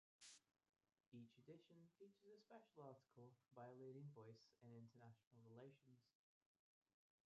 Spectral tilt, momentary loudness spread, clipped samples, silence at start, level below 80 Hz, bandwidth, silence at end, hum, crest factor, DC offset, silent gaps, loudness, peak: -6.5 dB/octave; 8 LU; under 0.1%; 0.2 s; under -90 dBFS; 7.2 kHz; 1.15 s; none; 20 dB; under 0.1%; 1.08-1.12 s, 5.27-5.31 s; -65 LUFS; -48 dBFS